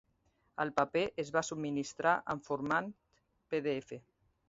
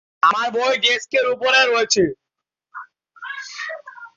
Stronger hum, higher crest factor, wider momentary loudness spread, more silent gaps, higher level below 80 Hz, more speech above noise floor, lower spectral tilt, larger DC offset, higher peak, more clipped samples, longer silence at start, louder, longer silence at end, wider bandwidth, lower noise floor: neither; about the same, 22 dB vs 18 dB; second, 13 LU vs 22 LU; neither; second, -70 dBFS vs -62 dBFS; second, 41 dB vs 66 dB; first, -4 dB/octave vs -1.5 dB/octave; neither; second, -14 dBFS vs -4 dBFS; neither; first, 0.6 s vs 0.25 s; second, -35 LUFS vs -17 LUFS; first, 0.5 s vs 0.1 s; about the same, 7.6 kHz vs 7.8 kHz; second, -76 dBFS vs -83 dBFS